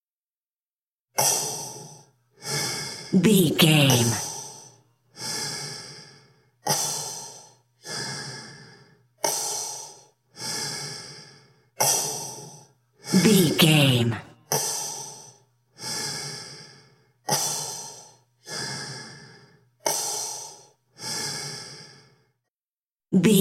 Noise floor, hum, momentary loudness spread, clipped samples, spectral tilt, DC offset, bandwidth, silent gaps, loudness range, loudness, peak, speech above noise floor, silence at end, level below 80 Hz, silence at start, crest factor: under -90 dBFS; none; 23 LU; under 0.1%; -3.5 dB/octave; under 0.1%; 16.5 kHz; 22.50-22.57 s, 22.77-22.90 s; 9 LU; -24 LUFS; -4 dBFS; over 72 dB; 0 s; -66 dBFS; 1.15 s; 22 dB